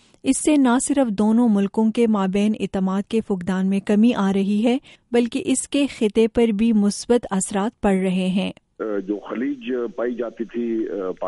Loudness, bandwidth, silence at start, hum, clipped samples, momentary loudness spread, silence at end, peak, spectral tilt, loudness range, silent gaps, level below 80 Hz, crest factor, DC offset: -21 LUFS; 11.5 kHz; 0.25 s; none; under 0.1%; 9 LU; 0 s; -6 dBFS; -5.5 dB/octave; 4 LU; none; -50 dBFS; 14 dB; under 0.1%